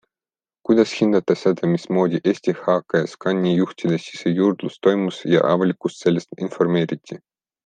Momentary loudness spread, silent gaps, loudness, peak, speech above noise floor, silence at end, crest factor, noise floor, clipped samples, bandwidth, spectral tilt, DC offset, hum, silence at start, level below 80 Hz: 6 LU; none; -20 LUFS; -2 dBFS; over 70 dB; 0.5 s; 18 dB; under -90 dBFS; under 0.1%; 9.2 kHz; -7 dB/octave; under 0.1%; none; 0.7 s; -64 dBFS